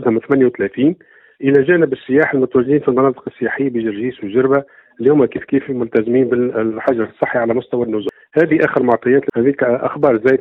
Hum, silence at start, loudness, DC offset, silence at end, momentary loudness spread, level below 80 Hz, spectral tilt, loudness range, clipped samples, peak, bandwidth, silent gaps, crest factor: none; 0 s; -16 LUFS; under 0.1%; 0 s; 6 LU; -56 dBFS; -9.5 dB/octave; 2 LU; under 0.1%; 0 dBFS; 4.1 kHz; none; 14 dB